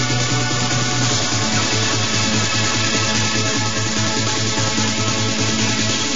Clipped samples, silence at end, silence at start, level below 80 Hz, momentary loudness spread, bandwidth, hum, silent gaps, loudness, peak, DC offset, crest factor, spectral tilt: under 0.1%; 0 s; 0 s; -44 dBFS; 2 LU; 7.8 kHz; none; none; -17 LUFS; -4 dBFS; 4%; 14 dB; -3 dB/octave